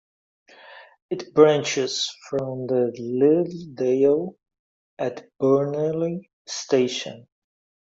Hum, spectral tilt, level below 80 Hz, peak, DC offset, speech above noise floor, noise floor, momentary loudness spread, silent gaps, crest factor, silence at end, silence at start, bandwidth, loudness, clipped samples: none; -5 dB/octave; -68 dBFS; -4 dBFS; under 0.1%; 25 dB; -47 dBFS; 15 LU; 1.02-1.09 s, 4.59-4.97 s, 6.33-6.45 s; 20 dB; 0.8 s; 0.65 s; 7.8 kHz; -23 LUFS; under 0.1%